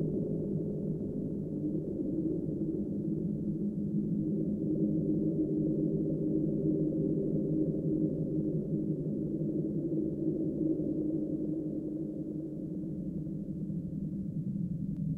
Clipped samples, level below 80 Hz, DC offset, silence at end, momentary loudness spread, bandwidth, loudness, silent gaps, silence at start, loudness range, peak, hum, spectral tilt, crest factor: under 0.1%; -54 dBFS; under 0.1%; 0 s; 6 LU; 1.4 kHz; -34 LUFS; none; 0 s; 5 LU; -20 dBFS; none; -13 dB/octave; 14 dB